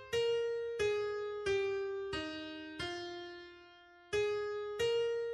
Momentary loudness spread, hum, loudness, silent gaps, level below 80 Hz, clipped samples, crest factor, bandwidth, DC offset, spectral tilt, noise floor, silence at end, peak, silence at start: 12 LU; none; -37 LUFS; none; -64 dBFS; under 0.1%; 14 dB; 12.5 kHz; under 0.1%; -4 dB/octave; -59 dBFS; 0 s; -24 dBFS; 0 s